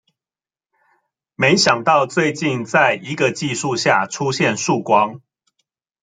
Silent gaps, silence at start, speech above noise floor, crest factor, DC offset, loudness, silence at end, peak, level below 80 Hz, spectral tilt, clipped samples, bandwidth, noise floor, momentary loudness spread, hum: none; 1.4 s; over 73 dB; 18 dB; under 0.1%; -17 LUFS; 0.85 s; -2 dBFS; -62 dBFS; -4 dB/octave; under 0.1%; 9.6 kHz; under -90 dBFS; 7 LU; none